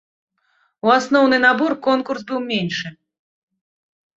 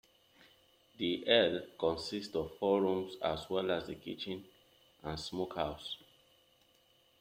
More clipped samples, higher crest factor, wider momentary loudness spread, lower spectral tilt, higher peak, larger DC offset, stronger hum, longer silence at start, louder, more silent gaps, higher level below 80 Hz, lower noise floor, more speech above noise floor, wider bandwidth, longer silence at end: neither; second, 18 dB vs 24 dB; second, 11 LU vs 15 LU; about the same, -5 dB/octave vs -5 dB/octave; first, -2 dBFS vs -12 dBFS; neither; neither; second, 0.85 s vs 1 s; first, -18 LUFS vs -35 LUFS; neither; about the same, -64 dBFS vs -64 dBFS; second, -64 dBFS vs -69 dBFS; first, 47 dB vs 34 dB; second, 7.8 kHz vs 16 kHz; about the same, 1.25 s vs 1.25 s